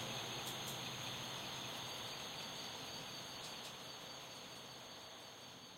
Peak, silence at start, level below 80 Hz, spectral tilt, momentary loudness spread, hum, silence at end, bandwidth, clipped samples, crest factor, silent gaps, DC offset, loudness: -32 dBFS; 0 s; -76 dBFS; -2 dB/octave; 8 LU; none; 0 s; 16 kHz; under 0.1%; 16 dB; none; under 0.1%; -47 LUFS